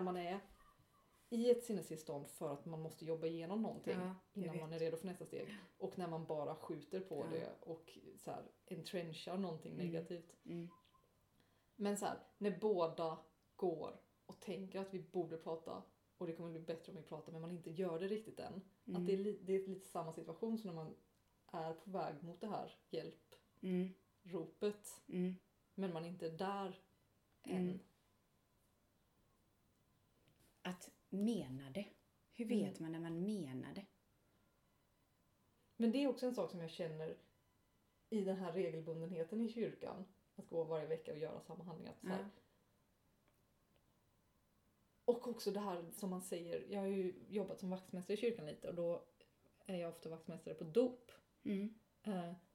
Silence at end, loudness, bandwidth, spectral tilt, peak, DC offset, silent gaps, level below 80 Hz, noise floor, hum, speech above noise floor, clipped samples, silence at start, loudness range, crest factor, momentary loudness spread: 0.15 s; -45 LUFS; 16.5 kHz; -6.5 dB/octave; -22 dBFS; under 0.1%; none; -82 dBFS; -78 dBFS; none; 34 dB; under 0.1%; 0 s; 5 LU; 22 dB; 12 LU